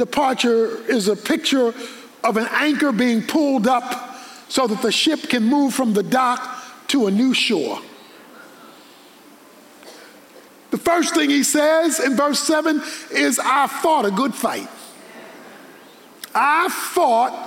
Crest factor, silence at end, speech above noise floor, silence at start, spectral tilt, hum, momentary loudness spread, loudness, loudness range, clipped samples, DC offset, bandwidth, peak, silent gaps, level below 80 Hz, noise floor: 14 dB; 0 s; 28 dB; 0 s; -3 dB/octave; none; 15 LU; -18 LUFS; 6 LU; under 0.1%; under 0.1%; 17 kHz; -6 dBFS; none; -64 dBFS; -46 dBFS